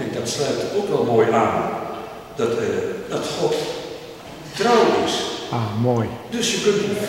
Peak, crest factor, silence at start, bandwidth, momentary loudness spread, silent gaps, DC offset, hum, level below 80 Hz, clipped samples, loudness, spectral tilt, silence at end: -4 dBFS; 16 dB; 0 s; 16.5 kHz; 15 LU; none; under 0.1%; none; -54 dBFS; under 0.1%; -21 LUFS; -4.5 dB/octave; 0 s